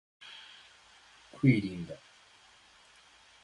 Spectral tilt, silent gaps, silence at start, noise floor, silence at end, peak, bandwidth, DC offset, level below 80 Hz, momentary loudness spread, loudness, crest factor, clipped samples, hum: -7.5 dB/octave; none; 0.2 s; -60 dBFS; 1.45 s; -12 dBFS; 11 kHz; under 0.1%; -66 dBFS; 27 LU; -30 LUFS; 24 dB; under 0.1%; none